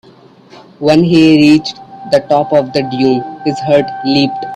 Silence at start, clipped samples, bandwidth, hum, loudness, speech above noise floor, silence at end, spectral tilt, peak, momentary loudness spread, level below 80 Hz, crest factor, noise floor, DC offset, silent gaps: 0.55 s; under 0.1%; 10 kHz; none; -11 LUFS; 31 dB; 0 s; -6.5 dB/octave; 0 dBFS; 10 LU; -50 dBFS; 12 dB; -41 dBFS; under 0.1%; none